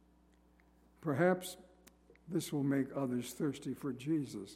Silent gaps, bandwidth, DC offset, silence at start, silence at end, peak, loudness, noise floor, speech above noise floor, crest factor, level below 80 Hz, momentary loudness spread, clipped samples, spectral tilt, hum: none; 16 kHz; under 0.1%; 1 s; 0 s; -18 dBFS; -37 LUFS; -67 dBFS; 31 dB; 20 dB; -70 dBFS; 9 LU; under 0.1%; -6 dB/octave; none